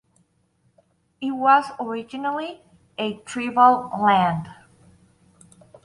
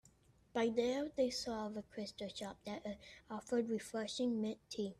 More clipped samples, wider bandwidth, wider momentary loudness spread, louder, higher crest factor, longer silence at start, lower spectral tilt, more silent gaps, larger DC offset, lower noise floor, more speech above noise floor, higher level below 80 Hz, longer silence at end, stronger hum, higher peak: neither; second, 11.5 kHz vs 13.5 kHz; first, 15 LU vs 10 LU; first, -21 LUFS vs -41 LUFS; about the same, 22 dB vs 18 dB; first, 1.2 s vs 0.55 s; about the same, -5.5 dB/octave vs -4.5 dB/octave; neither; neither; second, -65 dBFS vs -69 dBFS; first, 45 dB vs 29 dB; first, -62 dBFS vs -72 dBFS; first, 1.3 s vs 0.05 s; neither; first, -2 dBFS vs -24 dBFS